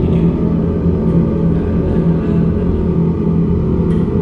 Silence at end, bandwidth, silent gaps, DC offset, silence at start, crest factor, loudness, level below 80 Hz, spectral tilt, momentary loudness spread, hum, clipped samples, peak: 0 s; 4.2 kHz; none; under 0.1%; 0 s; 12 dB; -15 LUFS; -26 dBFS; -11.5 dB/octave; 2 LU; none; under 0.1%; -2 dBFS